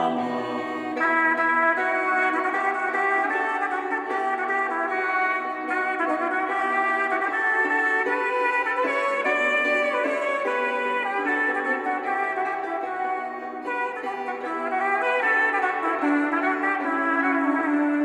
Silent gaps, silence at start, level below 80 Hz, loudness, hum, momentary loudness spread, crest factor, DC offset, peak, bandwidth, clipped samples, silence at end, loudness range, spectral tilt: none; 0 s; -74 dBFS; -23 LUFS; none; 7 LU; 14 dB; under 0.1%; -10 dBFS; 11 kHz; under 0.1%; 0 s; 4 LU; -4 dB/octave